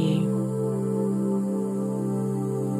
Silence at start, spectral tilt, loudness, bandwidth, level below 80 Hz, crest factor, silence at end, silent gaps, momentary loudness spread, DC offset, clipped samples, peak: 0 s; -8.5 dB/octave; -26 LUFS; 14.5 kHz; -68 dBFS; 14 dB; 0 s; none; 3 LU; under 0.1%; under 0.1%; -12 dBFS